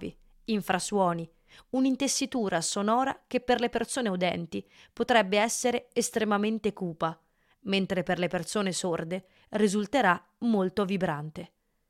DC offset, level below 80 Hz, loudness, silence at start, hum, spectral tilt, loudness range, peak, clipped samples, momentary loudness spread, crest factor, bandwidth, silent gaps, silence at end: under 0.1%; -62 dBFS; -28 LUFS; 0 s; none; -4 dB/octave; 2 LU; -10 dBFS; under 0.1%; 11 LU; 20 dB; 16 kHz; none; 0.45 s